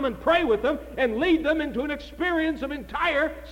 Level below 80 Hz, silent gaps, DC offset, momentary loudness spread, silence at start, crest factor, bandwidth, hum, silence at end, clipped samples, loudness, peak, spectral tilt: -44 dBFS; none; under 0.1%; 8 LU; 0 s; 14 dB; 16.5 kHz; none; 0 s; under 0.1%; -25 LUFS; -10 dBFS; -5.5 dB/octave